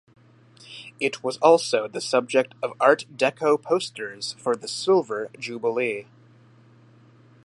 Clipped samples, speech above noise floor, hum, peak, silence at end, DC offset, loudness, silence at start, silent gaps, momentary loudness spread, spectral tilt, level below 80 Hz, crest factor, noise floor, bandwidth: under 0.1%; 30 dB; none; -2 dBFS; 1.45 s; under 0.1%; -23 LUFS; 0.7 s; none; 12 LU; -3.5 dB/octave; -78 dBFS; 22 dB; -53 dBFS; 11.5 kHz